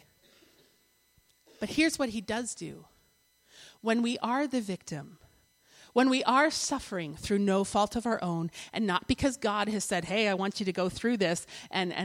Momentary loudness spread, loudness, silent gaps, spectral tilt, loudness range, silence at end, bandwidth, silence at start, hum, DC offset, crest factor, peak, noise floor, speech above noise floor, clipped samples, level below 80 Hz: 11 LU; -30 LUFS; none; -4 dB/octave; 6 LU; 0 s; 16 kHz; 1.6 s; none; under 0.1%; 20 dB; -10 dBFS; -68 dBFS; 38 dB; under 0.1%; -58 dBFS